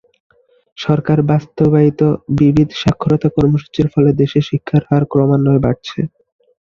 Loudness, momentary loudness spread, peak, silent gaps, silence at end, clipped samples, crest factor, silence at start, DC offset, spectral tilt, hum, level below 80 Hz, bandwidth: -14 LUFS; 6 LU; 0 dBFS; none; 0.6 s; under 0.1%; 14 dB; 0.8 s; under 0.1%; -8.5 dB/octave; none; -42 dBFS; 7 kHz